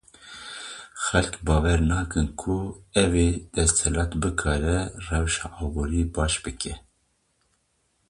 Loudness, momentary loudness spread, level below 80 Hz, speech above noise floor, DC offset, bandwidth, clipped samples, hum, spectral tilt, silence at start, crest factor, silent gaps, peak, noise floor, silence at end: -25 LUFS; 15 LU; -32 dBFS; 46 dB; under 0.1%; 11.5 kHz; under 0.1%; none; -4.5 dB/octave; 0.2 s; 22 dB; none; -4 dBFS; -70 dBFS; 1.3 s